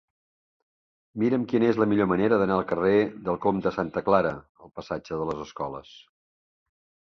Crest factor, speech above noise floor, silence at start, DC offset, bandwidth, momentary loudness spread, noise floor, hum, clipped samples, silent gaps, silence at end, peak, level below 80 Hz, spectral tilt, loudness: 20 dB; over 65 dB; 1.15 s; under 0.1%; 6.6 kHz; 13 LU; under -90 dBFS; none; under 0.1%; 4.49-4.55 s; 1.05 s; -6 dBFS; -56 dBFS; -8 dB/octave; -25 LUFS